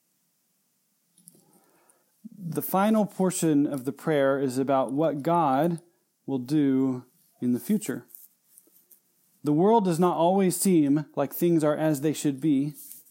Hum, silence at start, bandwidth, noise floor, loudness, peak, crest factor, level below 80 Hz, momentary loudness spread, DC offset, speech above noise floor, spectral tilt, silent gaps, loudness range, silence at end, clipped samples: none; 2.4 s; 17 kHz; -72 dBFS; -25 LUFS; -10 dBFS; 16 dB; -82 dBFS; 12 LU; under 0.1%; 48 dB; -6.5 dB/octave; none; 6 LU; 0.1 s; under 0.1%